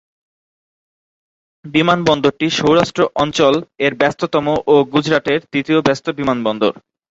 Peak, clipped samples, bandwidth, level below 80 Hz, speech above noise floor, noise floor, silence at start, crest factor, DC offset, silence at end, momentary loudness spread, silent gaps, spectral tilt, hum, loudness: 0 dBFS; under 0.1%; 8 kHz; -52 dBFS; over 75 dB; under -90 dBFS; 1.65 s; 16 dB; under 0.1%; 0.4 s; 5 LU; none; -5.5 dB/octave; none; -16 LUFS